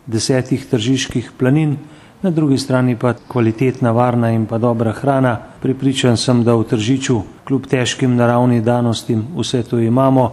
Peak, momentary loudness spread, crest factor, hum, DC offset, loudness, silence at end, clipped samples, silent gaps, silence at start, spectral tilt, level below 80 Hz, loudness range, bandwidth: 0 dBFS; 6 LU; 16 dB; none; under 0.1%; -16 LUFS; 0 s; under 0.1%; none; 0.05 s; -6 dB/octave; -48 dBFS; 2 LU; 12.5 kHz